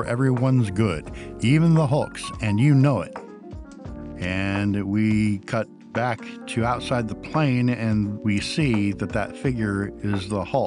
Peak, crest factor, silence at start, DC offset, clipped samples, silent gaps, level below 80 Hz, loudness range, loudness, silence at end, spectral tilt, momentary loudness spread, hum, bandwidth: -8 dBFS; 14 dB; 0 s; under 0.1%; under 0.1%; none; -44 dBFS; 4 LU; -23 LUFS; 0 s; -7 dB/octave; 13 LU; none; 11.5 kHz